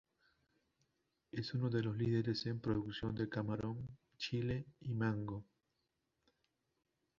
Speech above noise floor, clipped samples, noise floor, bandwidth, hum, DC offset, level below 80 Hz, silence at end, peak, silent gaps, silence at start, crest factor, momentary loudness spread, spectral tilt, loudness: 46 dB; under 0.1%; -86 dBFS; 7.4 kHz; none; under 0.1%; -66 dBFS; 1.75 s; -24 dBFS; none; 1.35 s; 18 dB; 10 LU; -6 dB/octave; -41 LUFS